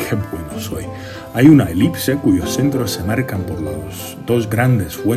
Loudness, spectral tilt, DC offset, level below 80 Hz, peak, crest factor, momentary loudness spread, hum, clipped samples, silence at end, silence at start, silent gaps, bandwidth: -17 LUFS; -6.5 dB/octave; 0.2%; -42 dBFS; 0 dBFS; 16 dB; 16 LU; none; under 0.1%; 0 s; 0 s; none; 15 kHz